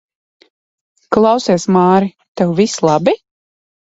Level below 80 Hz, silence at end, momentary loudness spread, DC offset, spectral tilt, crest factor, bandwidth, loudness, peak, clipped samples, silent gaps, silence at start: -54 dBFS; 0.7 s; 7 LU; under 0.1%; -6 dB/octave; 16 dB; 8 kHz; -14 LUFS; 0 dBFS; under 0.1%; 2.28-2.35 s; 1.1 s